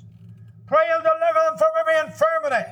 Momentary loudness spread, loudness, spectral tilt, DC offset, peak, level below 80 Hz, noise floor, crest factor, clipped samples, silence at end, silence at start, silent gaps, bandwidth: 3 LU; -20 LUFS; -4 dB/octave; under 0.1%; -8 dBFS; -70 dBFS; -44 dBFS; 14 dB; under 0.1%; 0 s; 0.05 s; none; 12.5 kHz